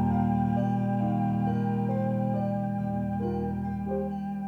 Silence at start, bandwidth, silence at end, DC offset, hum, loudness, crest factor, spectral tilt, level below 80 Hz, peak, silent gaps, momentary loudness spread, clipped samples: 0 s; 4.8 kHz; 0 s; under 0.1%; none; -29 LUFS; 12 dB; -10.5 dB/octave; -48 dBFS; -16 dBFS; none; 5 LU; under 0.1%